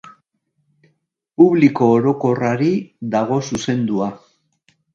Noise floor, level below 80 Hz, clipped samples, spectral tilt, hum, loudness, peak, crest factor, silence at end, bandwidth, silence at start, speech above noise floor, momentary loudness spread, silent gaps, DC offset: -69 dBFS; -58 dBFS; under 0.1%; -7 dB/octave; none; -17 LUFS; 0 dBFS; 18 dB; 0.75 s; 7.8 kHz; 1.4 s; 53 dB; 10 LU; none; under 0.1%